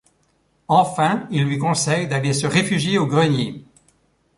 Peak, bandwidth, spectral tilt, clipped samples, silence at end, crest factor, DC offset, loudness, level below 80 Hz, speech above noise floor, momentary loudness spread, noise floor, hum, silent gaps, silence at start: -4 dBFS; 11.5 kHz; -5 dB/octave; under 0.1%; 0.75 s; 18 dB; under 0.1%; -19 LUFS; -56 dBFS; 45 dB; 4 LU; -63 dBFS; none; none; 0.7 s